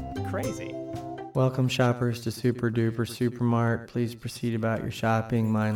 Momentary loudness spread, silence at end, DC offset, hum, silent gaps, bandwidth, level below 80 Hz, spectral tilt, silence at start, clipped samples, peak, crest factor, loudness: 8 LU; 0 s; under 0.1%; none; none; 16 kHz; -54 dBFS; -6.5 dB/octave; 0 s; under 0.1%; -10 dBFS; 18 dB; -28 LUFS